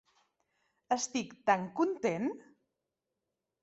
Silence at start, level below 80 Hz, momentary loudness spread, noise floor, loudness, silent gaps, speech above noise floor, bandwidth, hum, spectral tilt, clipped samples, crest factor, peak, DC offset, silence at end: 0.9 s; -78 dBFS; 6 LU; -87 dBFS; -33 LUFS; none; 55 dB; 8 kHz; none; -4 dB/octave; under 0.1%; 24 dB; -12 dBFS; under 0.1%; 1.2 s